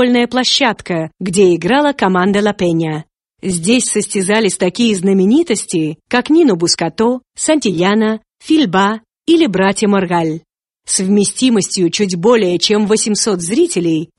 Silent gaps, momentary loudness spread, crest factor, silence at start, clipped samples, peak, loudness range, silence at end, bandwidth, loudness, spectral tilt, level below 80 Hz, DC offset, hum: none; 7 LU; 14 dB; 0 s; under 0.1%; 0 dBFS; 1 LU; 0.15 s; 11.5 kHz; -13 LUFS; -4 dB/octave; -52 dBFS; under 0.1%; none